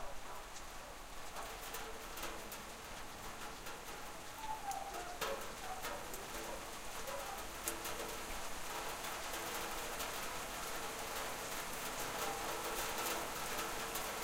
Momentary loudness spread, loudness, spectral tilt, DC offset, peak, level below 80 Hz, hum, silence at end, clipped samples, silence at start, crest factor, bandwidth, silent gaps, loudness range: 8 LU; -43 LUFS; -1.5 dB/octave; under 0.1%; -16 dBFS; -56 dBFS; none; 0 s; under 0.1%; 0 s; 28 dB; 16 kHz; none; 6 LU